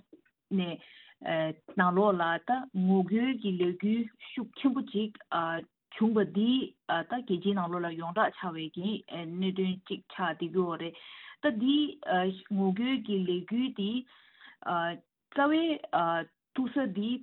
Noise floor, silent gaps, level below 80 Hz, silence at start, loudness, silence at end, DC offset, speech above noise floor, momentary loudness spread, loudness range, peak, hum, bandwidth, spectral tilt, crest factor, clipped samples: -62 dBFS; none; -76 dBFS; 0.5 s; -31 LUFS; 0 s; under 0.1%; 31 dB; 11 LU; 4 LU; -10 dBFS; none; 4.2 kHz; -10 dB/octave; 20 dB; under 0.1%